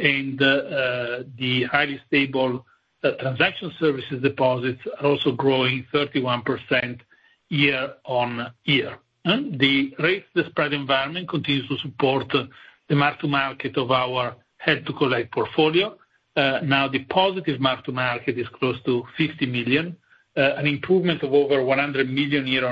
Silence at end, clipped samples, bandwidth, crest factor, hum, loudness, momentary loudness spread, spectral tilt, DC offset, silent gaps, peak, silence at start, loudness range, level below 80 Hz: 0 s; under 0.1%; 5.4 kHz; 20 dB; none; -22 LUFS; 7 LU; -8 dB/octave; under 0.1%; none; -2 dBFS; 0 s; 2 LU; -62 dBFS